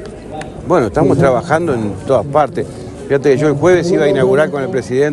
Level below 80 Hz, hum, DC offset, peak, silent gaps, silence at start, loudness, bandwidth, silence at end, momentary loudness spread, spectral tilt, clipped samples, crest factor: -40 dBFS; none; under 0.1%; 0 dBFS; none; 0 s; -13 LUFS; 11.5 kHz; 0 s; 14 LU; -7 dB/octave; under 0.1%; 14 dB